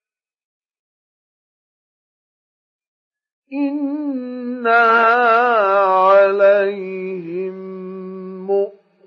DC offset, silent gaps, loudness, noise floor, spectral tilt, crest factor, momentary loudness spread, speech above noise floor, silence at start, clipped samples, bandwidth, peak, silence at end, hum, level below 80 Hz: under 0.1%; none; -16 LUFS; under -90 dBFS; -7 dB/octave; 16 dB; 19 LU; over 74 dB; 3.5 s; under 0.1%; 6 kHz; -4 dBFS; 0.35 s; none; -86 dBFS